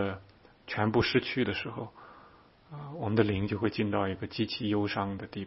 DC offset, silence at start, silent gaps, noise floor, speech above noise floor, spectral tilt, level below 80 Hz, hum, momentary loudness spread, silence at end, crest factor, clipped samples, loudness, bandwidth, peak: under 0.1%; 0 s; none; -58 dBFS; 27 dB; -9.5 dB/octave; -58 dBFS; none; 16 LU; 0 s; 22 dB; under 0.1%; -31 LUFS; 5.8 kHz; -10 dBFS